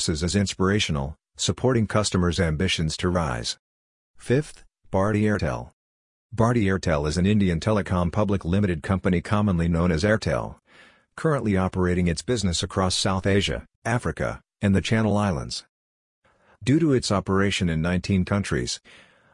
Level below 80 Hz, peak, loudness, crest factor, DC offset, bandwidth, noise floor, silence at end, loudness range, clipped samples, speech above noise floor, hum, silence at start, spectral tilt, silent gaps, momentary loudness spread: -44 dBFS; -6 dBFS; -24 LUFS; 18 dB; under 0.1%; 11 kHz; -54 dBFS; 0.55 s; 3 LU; under 0.1%; 31 dB; none; 0 s; -5.5 dB/octave; 3.59-4.14 s, 5.73-6.30 s, 13.75-13.82 s, 15.69-16.22 s; 8 LU